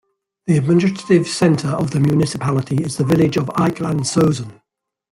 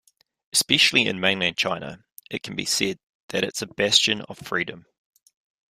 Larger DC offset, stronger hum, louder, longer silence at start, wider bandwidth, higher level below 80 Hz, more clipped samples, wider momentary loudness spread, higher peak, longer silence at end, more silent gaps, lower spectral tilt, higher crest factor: neither; neither; first, -17 LUFS vs -22 LUFS; about the same, 0.45 s vs 0.55 s; about the same, 15.5 kHz vs 15.5 kHz; first, -50 dBFS vs -62 dBFS; neither; second, 5 LU vs 15 LU; about the same, -2 dBFS vs -2 dBFS; second, 0.6 s vs 0.9 s; second, none vs 2.12-2.17 s, 3.04-3.28 s; first, -6.5 dB/octave vs -2 dB/octave; second, 16 dB vs 24 dB